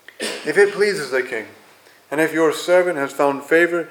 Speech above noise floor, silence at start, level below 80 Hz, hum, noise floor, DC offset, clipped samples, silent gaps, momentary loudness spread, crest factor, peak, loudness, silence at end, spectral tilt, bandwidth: 31 dB; 0.2 s; -78 dBFS; none; -49 dBFS; under 0.1%; under 0.1%; none; 11 LU; 16 dB; -2 dBFS; -19 LUFS; 0 s; -4 dB/octave; 18 kHz